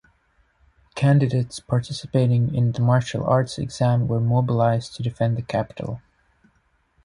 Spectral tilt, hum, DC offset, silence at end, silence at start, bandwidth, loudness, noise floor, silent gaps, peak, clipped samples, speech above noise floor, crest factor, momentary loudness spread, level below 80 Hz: -7.5 dB/octave; none; under 0.1%; 1.05 s; 0.95 s; 11 kHz; -22 LUFS; -65 dBFS; none; -4 dBFS; under 0.1%; 44 dB; 18 dB; 10 LU; -50 dBFS